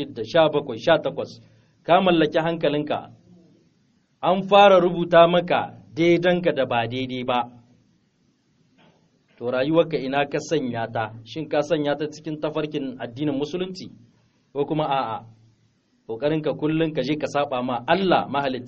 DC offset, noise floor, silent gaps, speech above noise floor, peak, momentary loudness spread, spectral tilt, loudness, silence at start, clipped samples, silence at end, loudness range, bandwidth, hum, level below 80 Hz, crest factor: under 0.1%; -65 dBFS; none; 43 dB; -2 dBFS; 14 LU; -4 dB/octave; -22 LUFS; 0 s; under 0.1%; 0 s; 9 LU; 7.4 kHz; none; -58 dBFS; 20 dB